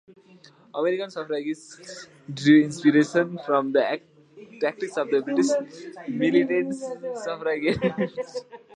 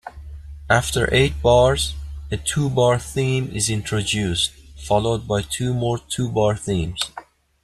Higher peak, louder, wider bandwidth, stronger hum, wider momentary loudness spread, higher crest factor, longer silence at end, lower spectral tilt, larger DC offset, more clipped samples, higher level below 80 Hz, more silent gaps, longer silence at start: second, -6 dBFS vs -2 dBFS; second, -24 LUFS vs -20 LUFS; second, 10.5 kHz vs 13 kHz; neither; first, 18 LU vs 13 LU; about the same, 20 dB vs 18 dB; second, 0.2 s vs 0.4 s; about the same, -5.5 dB/octave vs -4.5 dB/octave; neither; neither; second, -64 dBFS vs -36 dBFS; neither; first, 0.75 s vs 0.05 s